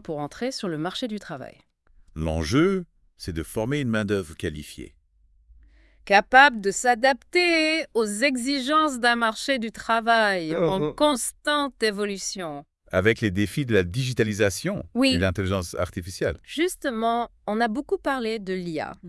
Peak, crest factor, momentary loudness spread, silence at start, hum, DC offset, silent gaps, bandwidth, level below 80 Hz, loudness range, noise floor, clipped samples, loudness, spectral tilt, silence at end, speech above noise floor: -2 dBFS; 24 dB; 12 LU; 0.05 s; none; under 0.1%; none; 12 kHz; -50 dBFS; 7 LU; -60 dBFS; under 0.1%; -24 LUFS; -4.5 dB/octave; 0 s; 37 dB